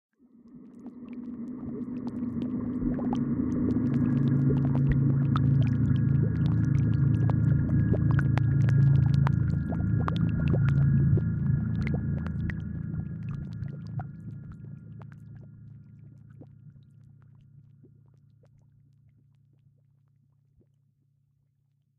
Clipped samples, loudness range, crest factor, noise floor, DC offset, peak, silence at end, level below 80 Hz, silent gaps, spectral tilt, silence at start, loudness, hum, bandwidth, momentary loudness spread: under 0.1%; 16 LU; 22 dB; -71 dBFS; under 0.1%; -6 dBFS; 5.3 s; -42 dBFS; none; -10.5 dB/octave; 0.55 s; -27 LUFS; none; 4.5 kHz; 19 LU